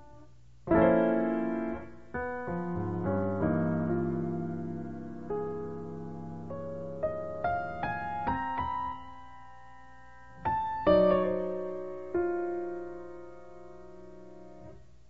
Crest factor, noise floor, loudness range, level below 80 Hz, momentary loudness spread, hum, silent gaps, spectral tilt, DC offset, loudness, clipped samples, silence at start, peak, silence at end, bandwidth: 20 dB; -56 dBFS; 7 LU; -54 dBFS; 24 LU; 60 Hz at -60 dBFS; none; -9.5 dB/octave; 0.4%; -32 LUFS; under 0.1%; 0 s; -12 dBFS; 0 s; 7.2 kHz